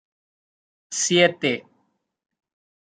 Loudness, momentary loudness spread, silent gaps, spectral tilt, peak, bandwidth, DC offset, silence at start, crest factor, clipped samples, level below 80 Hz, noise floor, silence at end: -21 LUFS; 13 LU; none; -3 dB/octave; -4 dBFS; 9.6 kHz; under 0.1%; 0.9 s; 22 dB; under 0.1%; -72 dBFS; -71 dBFS; 1.35 s